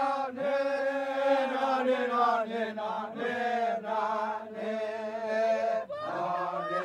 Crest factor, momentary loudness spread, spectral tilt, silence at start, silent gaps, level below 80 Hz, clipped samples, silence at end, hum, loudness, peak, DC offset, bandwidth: 16 dB; 7 LU; -5 dB/octave; 0 s; none; -86 dBFS; under 0.1%; 0 s; none; -30 LUFS; -14 dBFS; under 0.1%; 10.5 kHz